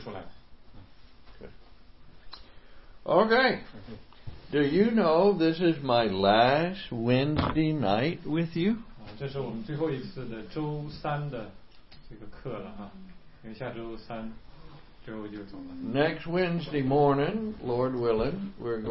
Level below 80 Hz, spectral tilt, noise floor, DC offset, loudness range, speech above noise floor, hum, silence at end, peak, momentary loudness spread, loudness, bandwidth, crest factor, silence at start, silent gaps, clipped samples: -50 dBFS; -10.5 dB/octave; -53 dBFS; 0.3%; 17 LU; 25 dB; none; 0 s; -8 dBFS; 22 LU; -27 LUFS; 5.8 kHz; 20 dB; 0 s; none; under 0.1%